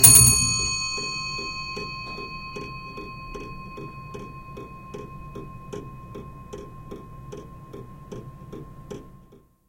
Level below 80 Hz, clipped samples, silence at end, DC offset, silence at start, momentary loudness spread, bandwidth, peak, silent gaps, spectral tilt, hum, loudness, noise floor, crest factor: -42 dBFS; under 0.1%; 0.5 s; under 0.1%; 0 s; 19 LU; 16.5 kHz; 0 dBFS; none; -1.5 dB/octave; none; -20 LUFS; -53 dBFS; 26 dB